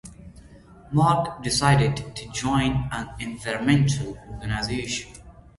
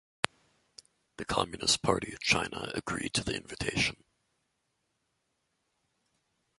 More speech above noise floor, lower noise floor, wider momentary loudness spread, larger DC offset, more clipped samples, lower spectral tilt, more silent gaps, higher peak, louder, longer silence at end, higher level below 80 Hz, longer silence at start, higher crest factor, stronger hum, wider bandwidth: second, 24 dB vs 48 dB; second, -48 dBFS vs -80 dBFS; first, 13 LU vs 8 LU; neither; neither; first, -5 dB/octave vs -2.5 dB/octave; neither; about the same, -4 dBFS vs -2 dBFS; first, -24 LUFS vs -31 LUFS; second, 0.25 s vs 2.65 s; first, -42 dBFS vs -56 dBFS; second, 0.05 s vs 1.2 s; second, 20 dB vs 34 dB; neither; about the same, 11.5 kHz vs 12 kHz